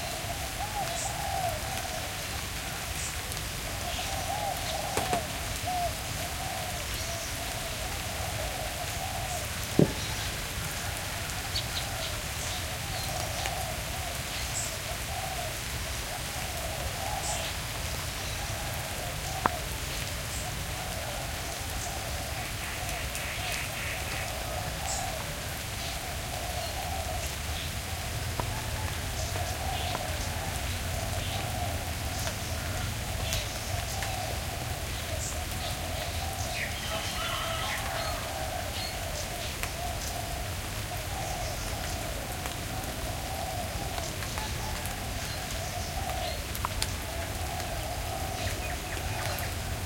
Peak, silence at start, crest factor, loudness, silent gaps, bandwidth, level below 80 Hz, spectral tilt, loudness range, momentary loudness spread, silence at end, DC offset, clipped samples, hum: -6 dBFS; 0 s; 28 dB; -33 LUFS; none; 17 kHz; -42 dBFS; -3 dB/octave; 2 LU; 3 LU; 0 s; under 0.1%; under 0.1%; none